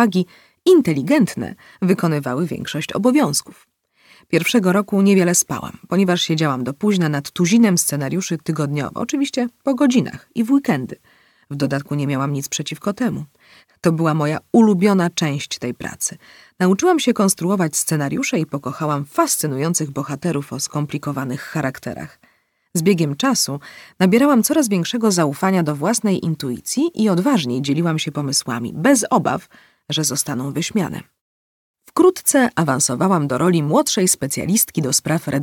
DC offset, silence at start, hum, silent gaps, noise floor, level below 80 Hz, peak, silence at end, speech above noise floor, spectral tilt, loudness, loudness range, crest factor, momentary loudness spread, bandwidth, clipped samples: under 0.1%; 0 s; none; 31.21-31.74 s; -53 dBFS; -60 dBFS; -2 dBFS; 0 s; 35 dB; -4.5 dB/octave; -18 LUFS; 5 LU; 16 dB; 10 LU; 18 kHz; under 0.1%